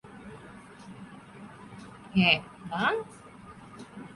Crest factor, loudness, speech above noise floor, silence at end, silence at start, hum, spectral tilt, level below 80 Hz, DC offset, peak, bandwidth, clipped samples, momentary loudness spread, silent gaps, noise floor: 24 dB; -27 LUFS; 22 dB; 0 s; 0.05 s; none; -5.5 dB/octave; -62 dBFS; under 0.1%; -8 dBFS; 11.5 kHz; under 0.1%; 25 LU; none; -49 dBFS